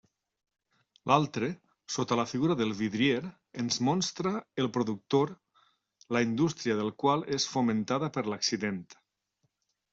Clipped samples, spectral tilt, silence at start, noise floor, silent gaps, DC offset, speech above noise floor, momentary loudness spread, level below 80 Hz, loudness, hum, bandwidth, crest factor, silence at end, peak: under 0.1%; -4.5 dB/octave; 1.05 s; -79 dBFS; none; under 0.1%; 49 dB; 8 LU; -70 dBFS; -30 LUFS; none; 8 kHz; 24 dB; 1 s; -8 dBFS